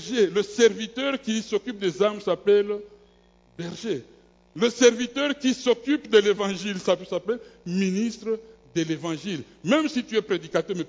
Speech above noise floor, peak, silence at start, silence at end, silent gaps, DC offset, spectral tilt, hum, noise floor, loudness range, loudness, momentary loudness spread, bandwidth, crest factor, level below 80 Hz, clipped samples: 34 dB; -6 dBFS; 0 s; 0 s; none; under 0.1%; -4.5 dB/octave; none; -58 dBFS; 4 LU; -25 LUFS; 12 LU; 7.8 kHz; 18 dB; -64 dBFS; under 0.1%